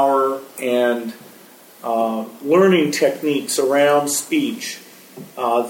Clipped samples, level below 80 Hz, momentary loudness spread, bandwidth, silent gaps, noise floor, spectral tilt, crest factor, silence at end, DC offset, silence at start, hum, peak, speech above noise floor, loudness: under 0.1%; -72 dBFS; 15 LU; 17.5 kHz; none; -45 dBFS; -4 dB/octave; 16 dB; 0 s; under 0.1%; 0 s; none; -2 dBFS; 26 dB; -18 LUFS